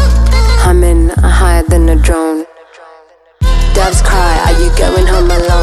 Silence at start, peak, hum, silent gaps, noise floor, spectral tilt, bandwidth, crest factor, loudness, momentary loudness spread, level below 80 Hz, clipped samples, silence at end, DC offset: 0 s; 0 dBFS; none; none; -41 dBFS; -5.5 dB/octave; 13.5 kHz; 8 dB; -10 LUFS; 5 LU; -10 dBFS; under 0.1%; 0 s; under 0.1%